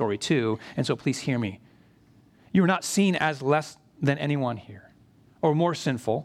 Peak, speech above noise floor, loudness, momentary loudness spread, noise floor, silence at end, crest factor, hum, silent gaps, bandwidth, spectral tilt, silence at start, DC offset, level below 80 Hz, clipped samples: -8 dBFS; 32 dB; -26 LUFS; 7 LU; -58 dBFS; 0 s; 18 dB; none; none; 14.5 kHz; -5.5 dB/octave; 0 s; under 0.1%; -66 dBFS; under 0.1%